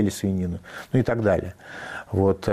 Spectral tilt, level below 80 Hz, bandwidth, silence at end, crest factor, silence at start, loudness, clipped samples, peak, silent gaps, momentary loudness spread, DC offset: -7 dB/octave; -48 dBFS; 15 kHz; 0 s; 16 dB; 0 s; -24 LUFS; under 0.1%; -8 dBFS; none; 14 LU; under 0.1%